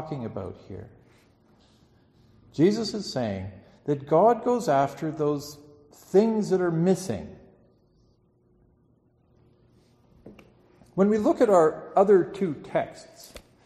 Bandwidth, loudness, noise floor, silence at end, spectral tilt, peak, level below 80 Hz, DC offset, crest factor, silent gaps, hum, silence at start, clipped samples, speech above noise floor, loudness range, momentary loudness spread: 13 kHz; -24 LUFS; -64 dBFS; 0.25 s; -6.5 dB/octave; -8 dBFS; -62 dBFS; under 0.1%; 20 dB; none; none; 0 s; under 0.1%; 40 dB; 7 LU; 22 LU